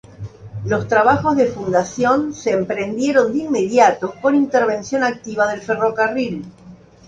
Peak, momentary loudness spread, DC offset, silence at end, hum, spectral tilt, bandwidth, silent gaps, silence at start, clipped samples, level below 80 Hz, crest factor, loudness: 0 dBFS; 10 LU; under 0.1%; 0.35 s; none; -5.5 dB/octave; 9.2 kHz; none; 0.2 s; under 0.1%; -50 dBFS; 16 dB; -18 LUFS